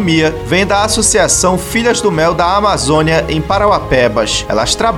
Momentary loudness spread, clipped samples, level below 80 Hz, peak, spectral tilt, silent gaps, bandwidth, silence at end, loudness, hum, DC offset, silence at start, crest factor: 4 LU; under 0.1%; -28 dBFS; 0 dBFS; -3.5 dB/octave; none; 17.5 kHz; 0 s; -11 LUFS; none; under 0.1%; 0 s; 12 dB